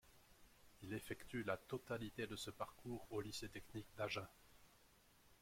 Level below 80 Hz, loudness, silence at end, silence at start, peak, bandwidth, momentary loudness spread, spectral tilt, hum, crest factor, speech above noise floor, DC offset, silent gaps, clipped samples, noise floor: -72 dBFS; -49 LUFS; 0.05 s; 0.05 s; -28 dBFS; 16.5 kHz; 23 LU; -4.5 dB/octave; none; 22 dB; 23 dB; under 0.1%; none; under 0.1%; -72 dBFS